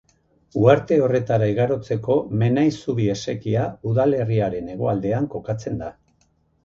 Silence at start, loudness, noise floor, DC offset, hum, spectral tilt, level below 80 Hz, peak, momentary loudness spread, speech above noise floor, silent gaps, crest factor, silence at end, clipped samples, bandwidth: 0.55 s; -21 LUFS; -63 dBFS; under 0.1%; none; -8 dB/octave; -50 dBFS; -2 dBFS; 10 LU; 43 dB; none; 20 dB; 0.75 s; under 0.1%; 7.4 kHz